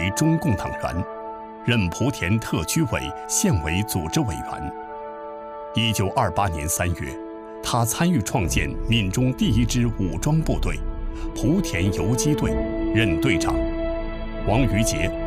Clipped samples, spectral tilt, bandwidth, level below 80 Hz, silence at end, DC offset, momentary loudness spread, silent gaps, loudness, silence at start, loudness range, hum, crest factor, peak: under 0.1%; -5 dB/octave; 16 kHz; -32 dBFS; 0 s; under 0.1%; 12 LU; none; -23 LUFS; 0 s; 3 LU; none; 16 dB; -6 dBFS